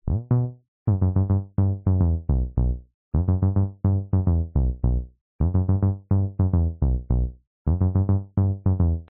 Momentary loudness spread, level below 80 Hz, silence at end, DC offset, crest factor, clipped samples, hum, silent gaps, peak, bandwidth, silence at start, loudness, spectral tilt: 6 LU; -28 dBFS; 0.05 s; under 0.1%; 12 dB; under 0.1%; none; 0.68-0.86 s, 2.94-3.12 s, 5.21-5.39 s, 7.47-7.65 s; -10 dBFS; 1.8 kHz; 0.05 s; -24 LUFS; -13 dB/octave